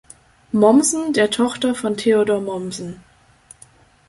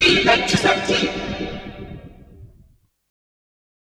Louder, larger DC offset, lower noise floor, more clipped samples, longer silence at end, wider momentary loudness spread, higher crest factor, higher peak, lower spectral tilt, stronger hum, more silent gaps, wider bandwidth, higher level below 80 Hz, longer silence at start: about the same, -18 LUFS vs -18 LUFS; neither; second, -50 dBFS vs -55 dBFS; neither; second, 1.15 s vs 1.5 s; second, 14 LU vs 22 LU; about the same, 18 dB vs 20 dB; about the same, -2 dBFS vs -2 dBFS; about the same, -4 dB/octave vs -3.5 dB/octave; neither; neither; second, 12 kHz vs 13.5 kHz; second, -58 dBFS vs -42 dBFS; first, 0.55 s vs 0 s